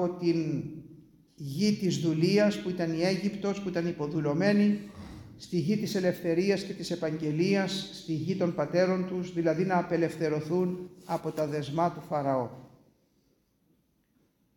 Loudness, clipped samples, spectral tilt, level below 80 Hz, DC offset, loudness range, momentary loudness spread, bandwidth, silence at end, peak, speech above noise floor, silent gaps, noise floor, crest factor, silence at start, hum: -29 LUFS; under 0.1%; -6.5 dB/octave; -64 dBFS; under 0.1%; 4 LU; 9 LU; 17 kHz; 1.9 s; -12 dBFS; 42 dB; none; -70 dBFS; 16 dB; 0 s; none